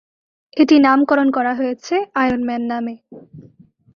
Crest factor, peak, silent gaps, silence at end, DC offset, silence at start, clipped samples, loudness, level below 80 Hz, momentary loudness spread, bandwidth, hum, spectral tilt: 16 dB; -2 dBFS; none; 0.55 s; under 0.1%; 0.55 s; under 0.1%; -16 LUFS; -56 dBFS; 14 LU; 7 kHz; none; -5 dB/octave